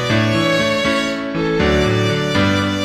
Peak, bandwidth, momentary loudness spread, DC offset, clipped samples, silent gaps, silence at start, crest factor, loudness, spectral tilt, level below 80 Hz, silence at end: -4 dBFS; 14 kHz; 4 LU; under 0.1%; under 0.1%; none; 0 s; 14 dB; -16 LUFS; -5.5 dB/octave; -34 dBFS; 0 s